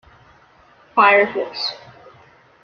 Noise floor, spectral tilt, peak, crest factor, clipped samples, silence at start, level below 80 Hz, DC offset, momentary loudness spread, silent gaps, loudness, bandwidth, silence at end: -51 dBFS; -4 dB/octave; -2 dBFS; 20 dB; under 0.1%; 0.95 s; -62 dBFS; under 0.1%; 13 LU; none; -17 LUFS; 6.8 kHz; 0.85 s